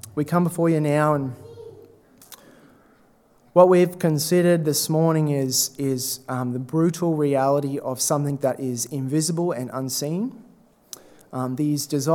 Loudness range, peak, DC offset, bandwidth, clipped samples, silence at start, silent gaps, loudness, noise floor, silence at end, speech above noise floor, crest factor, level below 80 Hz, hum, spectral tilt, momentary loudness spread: 6 LU; -2 dBFS; under 0.1%; 18.5 kHz; under 0.1%; 0.05 s; none; -22 LUFS; -57 dBFS; 0 s; 36 dB; 22 dB; -68 dBFS; none; -5.5 dB/octave; 12 LU